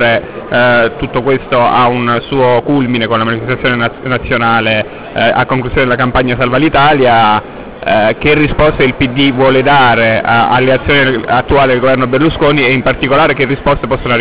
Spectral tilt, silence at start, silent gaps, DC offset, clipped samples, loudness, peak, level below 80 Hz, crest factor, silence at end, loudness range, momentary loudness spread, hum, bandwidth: -9.5 dB/octave; 0 s; none; 2%; under 0.1%; -10 LUFS; 0 dBFS; -30 dBFS; 10 dB; 0 s; 3 LU; 6 LU; none; 4 kHz